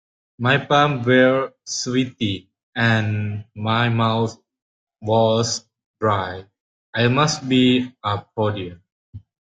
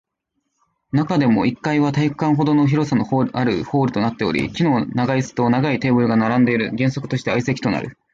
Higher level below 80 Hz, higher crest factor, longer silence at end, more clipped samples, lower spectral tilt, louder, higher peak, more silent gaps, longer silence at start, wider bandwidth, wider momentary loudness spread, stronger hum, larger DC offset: about the same, -56 dBFS vs -52 dBFS; about the same, 18 dB vs 14 dB; about the same, 0.25 s vs 0.2 s; neither; second, -5 dB/octave vs -7 dB/octave; about the same, -20 LUFS vs -19 LUFS; first, -2 dBFS vs -6 dBFS; first, 2.63-2.73 s, 4.62-4.87 s, 5.86-5.94 s, 6.60-6.93 s, 8.92-9.13 s vs none; second, 0.4 s vs 0.95 s; first, 9.4 kHz vs 7.8 kHz; first, 13 LU vs 5 LU; neither; neither